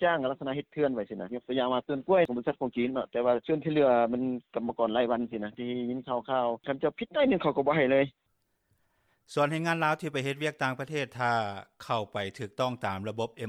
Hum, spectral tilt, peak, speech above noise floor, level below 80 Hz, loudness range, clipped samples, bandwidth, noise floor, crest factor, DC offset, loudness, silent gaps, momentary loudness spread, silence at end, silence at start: none; -6.5 dB/octave; -12 dBFS; 45 dB; -66 dBFS; 3 LU; under 0.1%; 14 kHz; -74 dBFS; 18 dB; under 0.1%; -30 LUFS; none; 9 LU; 0 s; 0 s